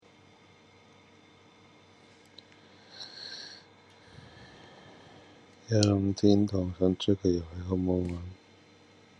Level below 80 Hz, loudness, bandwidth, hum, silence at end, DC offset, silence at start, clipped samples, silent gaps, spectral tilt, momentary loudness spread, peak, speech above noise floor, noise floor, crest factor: -64 dBFS; -29 LUFS; 9.6 kHz; none; 0.85 s; under 0.1%; 2.95 s; under 0.1%; none; -6.5 dB/octave; 27 LU; -8 dBFS; 31 dB; -58 dBFS; 24 dB